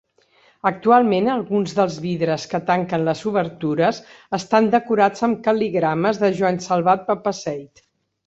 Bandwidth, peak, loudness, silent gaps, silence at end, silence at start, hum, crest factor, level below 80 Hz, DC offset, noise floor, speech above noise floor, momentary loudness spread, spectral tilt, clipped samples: 8 kHz; -2 dBFS; -20 LUFS; none; 0.6 s; 0.65 s; none; 18 dB; -62 dBFS; under 0.1%; -57 dBFS; 38 dB; 8 LU; -6 dB/octave; under 0.1%